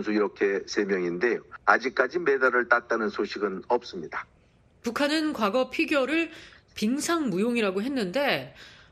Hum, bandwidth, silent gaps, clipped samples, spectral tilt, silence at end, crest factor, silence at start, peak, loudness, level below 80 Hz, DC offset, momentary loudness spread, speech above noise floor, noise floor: none; 13.5 kHz; none; under 0.1%; -4.5 dB/octave; 0.2 s; 24 dB; 0 s; -4 dBFS; -26 LUFS; -64 dBFS; under 0.1%; 11 LU; 34 dB; -60 dBFS